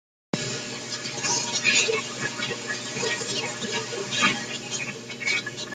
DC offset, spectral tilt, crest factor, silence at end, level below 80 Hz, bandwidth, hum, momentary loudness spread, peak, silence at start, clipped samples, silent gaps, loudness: under 0.1%; -1.5 dB/octave; 20 dB; 0 s; -66 dBFS; 14 kHz; none; 10 LU; -8 dBFS; 0.35 s; under 0.1%; none; -26 LUFS